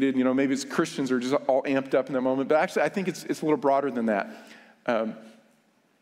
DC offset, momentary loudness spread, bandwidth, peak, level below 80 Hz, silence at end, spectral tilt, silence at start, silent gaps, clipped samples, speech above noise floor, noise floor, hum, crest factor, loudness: under 0.1%; 7 LU; 15 kHz; -8 dBFS; -74 dBFS; 0.7 s; -5.5 dB/octave; 0 s; none; under 0.1%; 39 dB; -65 dBFS; none; 18 dB; -26 LUFS